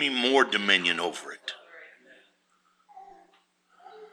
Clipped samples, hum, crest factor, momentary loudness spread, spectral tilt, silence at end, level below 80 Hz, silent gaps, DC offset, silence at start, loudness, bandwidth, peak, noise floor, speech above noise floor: under 0.1%; none; 24 dB; 17 LU; -2.5 dB/octave; 0.05 s; -86 dBFS; none; under 0.1%; 0 s; -24 LUFS; 13 kHz; -6 dBFS; -69 dBFS; 43 dB